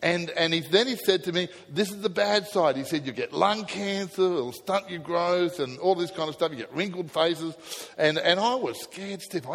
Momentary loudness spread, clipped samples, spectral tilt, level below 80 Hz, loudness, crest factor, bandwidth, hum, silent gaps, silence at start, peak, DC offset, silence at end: 10 LU; under 0.1%; -4 dB/octave; -70 dBFS; -26 LUFS; 20 dB; 16.5 kHz; none; none; 0 s; -6 dBFS; under 0.1%; 0 s